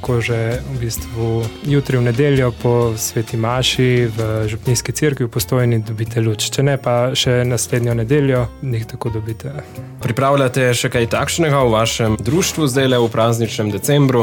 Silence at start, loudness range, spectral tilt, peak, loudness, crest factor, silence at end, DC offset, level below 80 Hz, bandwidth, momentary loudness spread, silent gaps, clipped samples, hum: 0 s; 3 LU; -5 dB/octave; -4 dBFS; -17 LUFS; 12 dB; 0 s; under 0.1%; -38 dBFS; 18.5 kHz; 8 LU; none; under 0.1%; none